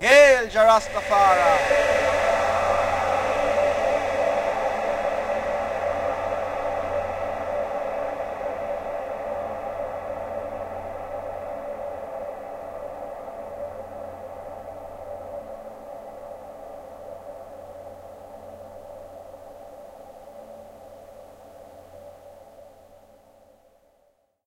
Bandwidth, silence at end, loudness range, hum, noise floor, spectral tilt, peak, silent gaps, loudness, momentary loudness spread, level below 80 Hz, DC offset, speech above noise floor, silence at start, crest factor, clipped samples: 16 kHz; 1.8 s; 23 LU; none; -65 dBFS; -3.5 dB/octave; -2 dBFS; none; -24 LUFS; 24 LU; -50 dBFS; under 0.1%; 46 dB; 0 s; 24 dB; under 0.1%